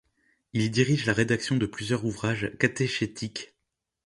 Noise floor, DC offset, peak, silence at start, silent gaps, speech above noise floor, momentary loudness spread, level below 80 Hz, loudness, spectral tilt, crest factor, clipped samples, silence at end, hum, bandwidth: -83 dBFS; under 0.1%; -6 dBFS; 0.55 s; none; 56 dB; 11 LU; -56 dBFS; -27 LUFS; -5.5 dB/octave; 22 dB; under 0.1%; 0.6 s; none; 11.5 kHz